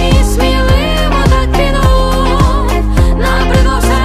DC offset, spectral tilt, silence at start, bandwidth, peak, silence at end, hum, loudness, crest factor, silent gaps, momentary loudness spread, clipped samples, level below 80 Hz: under 0.1%; -5.5 dB/octave; 0 s; 15 kHz; 0 dBFS; 0 s; none; -11 LUFS; 8 dB; none; 2 LU; under 0.1%; -12 dBFS